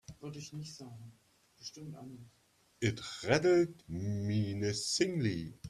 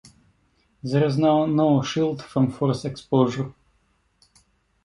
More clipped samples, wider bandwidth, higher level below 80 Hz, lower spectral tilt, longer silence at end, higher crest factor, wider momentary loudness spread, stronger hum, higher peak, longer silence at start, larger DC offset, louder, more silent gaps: neither; first, 13 kHz vs 11 kHz; second, -66 dBFS vs -58 dBFS; second, -5 dB/octave vs -7.5 dB/octave; second, 0 s vs 1.35 s; about the same, 22 dB vs 18 dB; first, 20 LU vs 10 LU; neither; second, -14 dBFS vs -6 dBFS; second, 0.1 s vs 0.85 s; neither; second, -34 LUFS vs -22 LUFS; neither